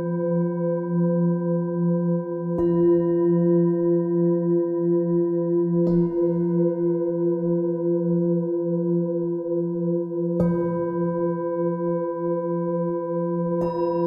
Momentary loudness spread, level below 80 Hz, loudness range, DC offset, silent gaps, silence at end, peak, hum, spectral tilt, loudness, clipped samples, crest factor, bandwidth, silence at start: 5 LU; -56 dBFS; 4 LU; under 0.1%; none; 0 s; -10 dBFS; none; -13 dB/octave; -23 LUFS; under 0.1%; 12 dB; 2.3 kHz; 0 s